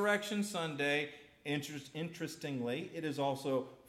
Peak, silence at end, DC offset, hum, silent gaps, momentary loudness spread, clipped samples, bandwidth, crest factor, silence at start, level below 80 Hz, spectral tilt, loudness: -18 dBFS; 0.1 s; under 0.1%; none; none; 9 LU; under 0.1%; 16 kHz; 18 dB; 0 s; -78 dBFS; -4.5 dB/octave; -38 LUFS